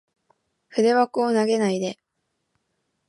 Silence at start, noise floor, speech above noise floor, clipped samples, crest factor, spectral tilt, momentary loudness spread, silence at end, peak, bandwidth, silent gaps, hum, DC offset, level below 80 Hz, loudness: 0.75 s; -76 dBFS; 56 dB; under 0.1%; 18 dB; -5 dB/octave; 10 LU; 1.15 s; -8 dBFS; 11.5 kHz; none; none; under 0.1%; -78 dBFS; -22 LUFS